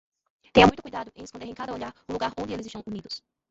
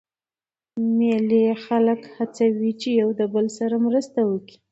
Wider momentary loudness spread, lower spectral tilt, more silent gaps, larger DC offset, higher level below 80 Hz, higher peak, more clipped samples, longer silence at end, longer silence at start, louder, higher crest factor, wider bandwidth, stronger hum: first, 21 LU vs 7 LU; about the same, -5.5 dB/octave vs -6.5 dB/octave; neither; neither; first, -48 dBFS vs -72 dBFS; first, -2 dBFS vs -8 dBFS; neither; about the same, 0.35 s vs 0.3 s; second, 0.55 s vs 0.75 s; second, -25 LUFS vs -22 LUFS; first, 26 dB vs 14 dB; about the same, 8 kHz vs 8 kHz; neither